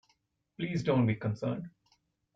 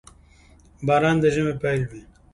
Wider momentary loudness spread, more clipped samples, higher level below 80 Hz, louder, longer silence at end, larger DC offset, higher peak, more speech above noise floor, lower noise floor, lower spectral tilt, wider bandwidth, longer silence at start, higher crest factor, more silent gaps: about the same, 12 LU vs 11 LU; neither; second, -66 dBFS vs -48 dBFS; second, -32 LUFS vs -22 LUFS; first, 0.65 s vs 0.35 s; neither; second, -16 dBFS vs -6 dBFS; first, 44 dB vs 31 dB; first, -75 dBFS vs -52 dBFS; about the same, -8 dB/octave vs -7 dB/octave; second, 7.8 kHz vs 11.5 kHz; second, 0.6 s vs 0.8 s; about the same, 18 dB vs 18 dB; neither